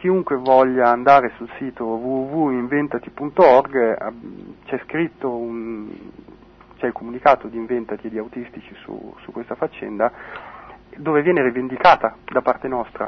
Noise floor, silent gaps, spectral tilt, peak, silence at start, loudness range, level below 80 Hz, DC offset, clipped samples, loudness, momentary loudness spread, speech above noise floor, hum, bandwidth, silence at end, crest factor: -46 dBFS; none; -7.5 dB/octave; 0 dBFS; 0 s; 10 LU; -54 dBFS; under 0.1%; under 0.1%; -19 LUFS; 21 LU; 26 dB; none; 6.4 kHz; 0 s; 20 dB